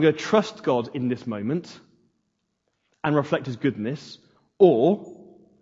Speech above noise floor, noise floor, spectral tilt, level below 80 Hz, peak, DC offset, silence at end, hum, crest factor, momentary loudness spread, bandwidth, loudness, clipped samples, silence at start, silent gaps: 53 dB; -75 dBFS; -7 dB/octave; -70 dBFS; -4 dBFS; under 0.1%; 0.4 s; none; 20 dB; 14 LU; 7.8 kHz; -23 LUFS; under 0.1%; 0 s; none